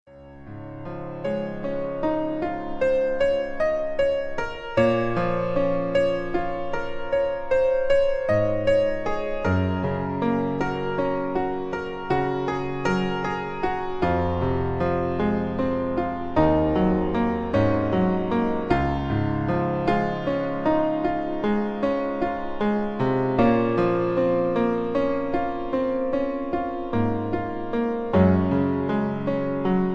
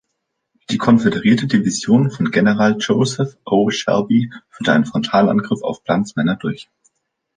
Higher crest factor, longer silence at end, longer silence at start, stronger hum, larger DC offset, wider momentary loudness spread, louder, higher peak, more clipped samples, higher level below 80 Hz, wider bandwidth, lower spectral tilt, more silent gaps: about the same, 18 dB vs 14 dB; second, 0 s vs 0.75 s; second, 0.1 s vs 0.7 s; neither; neither; about the same, 7 LU vs 9 LU; second, -24 LUFS vs -17 LUFS; second, -6 dBFS vs -2 dBFS; neither; first, -40 dBFS vs -54 dBFS; second, 7.8 kHz vs 9.6 kHz; first, -8.5 dB/octave vs -6 dB/octave; neither